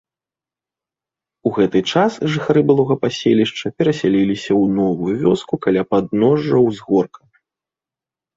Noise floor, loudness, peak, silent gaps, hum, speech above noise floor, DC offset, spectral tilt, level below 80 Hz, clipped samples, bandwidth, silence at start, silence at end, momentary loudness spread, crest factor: -90 dBFS; -17 LUFS; -2 dBFS; none; none; 73 dB; under 0.1%; -7 dB/octave; -54 dBFS; under 0.1%; 7.8 kHz; 1.45 s; 1.3 s; 4 LU; 16 dB